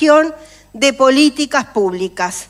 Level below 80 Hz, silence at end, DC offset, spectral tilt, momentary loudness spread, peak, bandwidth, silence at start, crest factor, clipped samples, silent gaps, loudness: -52 dBFS; 0.05 s; under 0.1%; -3 dB/octave; 9 LU; 0 dBFS; 13.5 kHz; 0 s; 14 dB; under 0.1%; none; -14 LUFS